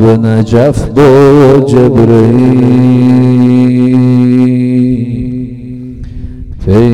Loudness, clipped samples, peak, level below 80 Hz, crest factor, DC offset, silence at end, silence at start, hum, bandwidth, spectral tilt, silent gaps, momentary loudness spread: -6 LUFS; 2%; 0 dBFS; -28 dBFS; 6 dB; 2%; 0 s; 0 s; none; 10.5 kHz; -9 dB/octave; none; 19 LU